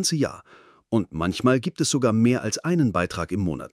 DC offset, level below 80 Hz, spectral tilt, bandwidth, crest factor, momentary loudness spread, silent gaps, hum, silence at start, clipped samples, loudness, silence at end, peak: under 0.1%; -54 dBFS; -5 dB/octave; 15.5 kHz; 18 dB; 6 LU; none; none; 0 s; under 0.1%; -23 LUFS; 0.05 s; -6 dBFS